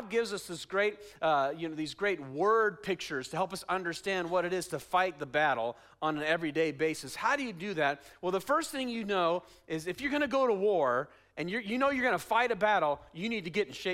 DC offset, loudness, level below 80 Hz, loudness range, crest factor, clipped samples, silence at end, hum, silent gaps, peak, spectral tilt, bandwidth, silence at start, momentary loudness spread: under 0.1%; -31 LUFS; -66 dBFS; 2 LU; 16 dB; under 0.1%; 0 s; none; none; -14 dBFS; -4.5 dB/octave; 16 kHz; 0 s; 8 LU